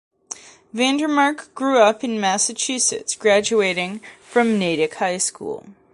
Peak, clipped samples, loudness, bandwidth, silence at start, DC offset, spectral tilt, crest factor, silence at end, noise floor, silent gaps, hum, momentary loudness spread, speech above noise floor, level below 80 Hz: -2 dBFS; under 0.1%; -19 LUFS; 11.5 kHz; 0.3 s; under 0.1%; -2.5 dB/octave; 18 dB; 0.2 s; -39 dBFS; none; none; 18 LU; 19 dB; -64 dBFS